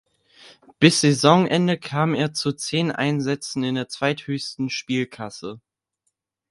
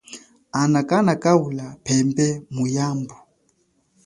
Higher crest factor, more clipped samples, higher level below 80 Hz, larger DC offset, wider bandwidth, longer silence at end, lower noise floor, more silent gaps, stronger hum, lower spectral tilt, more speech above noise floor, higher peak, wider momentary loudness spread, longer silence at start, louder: about the same, 22 dB vs 20 dB; neither; second, -64 dBFS vs -58 dBFS; neither; about the same, 11.5 kHz vs 11.5 kHz; about the same, 0.95 s vs 0.9 s; first, -76 dBFS vs -65 dBFS; neither; neither; about the same, -5 dB/octave vs -6 dB/octave; first, 54 dB vs 45 dB; about the same, 0 dBFS vs -2 dBFS; about the same, 13 LU vs 12 LU; first, 0.8 s vs 0.1 s; about the same, -21 LUFS vs -21 LUFS